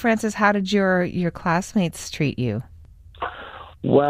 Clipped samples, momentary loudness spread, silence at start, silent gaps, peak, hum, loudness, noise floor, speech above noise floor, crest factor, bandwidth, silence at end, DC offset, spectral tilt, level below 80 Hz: under 0.1%; 13 LU; 0 s; none; -4 dBFS; none; -23 LUFS; -45 dBFS; 24 dB; 18 dB; 15.5 kHz; 0 s; under 0.1%; -6 dB/octave; -48 dBFS